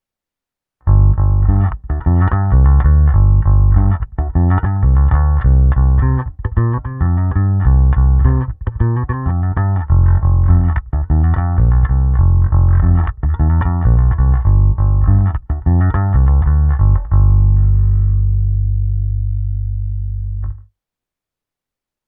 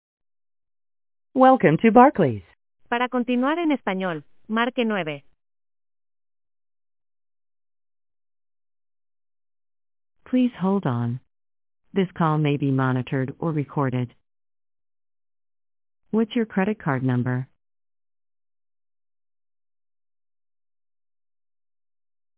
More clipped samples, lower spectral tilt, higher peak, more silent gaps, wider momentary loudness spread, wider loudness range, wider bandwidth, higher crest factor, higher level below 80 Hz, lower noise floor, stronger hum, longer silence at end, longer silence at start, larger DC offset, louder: neither; first, -14 dB/octave vs -11 dB/octave; about the same, 0 dBFS vs -2 dBFS; neither; second, 7 LU vs 14 LU; second, 3 LU vs 11 LU; second, 2.4 kHz vs 4 kHz; second, 12 dB vs 24 dB; first, -14 dBFS vs -62 dBFS; second, -86 dBFS vs under -90 dBFS; neither; second, 1.5 s vs 4.9 s; second, 0.85 s vs 1.35 s; neither; first, -14 LUFS vs -22 LUFS